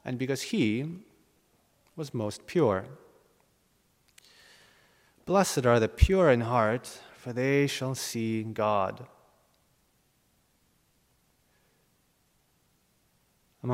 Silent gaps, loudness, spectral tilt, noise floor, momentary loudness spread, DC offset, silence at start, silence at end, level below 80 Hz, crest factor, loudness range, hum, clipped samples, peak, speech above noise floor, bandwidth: none; -28 LUFS; -5.5 dB/octave; -70 dBFS; 19 LU; under 0.1%; 0.05 s; 0 s; -44 dBFS; 26 dB; 9 LU; none; under 0.1%; -6 dBFS; 43 dB; 16 kHz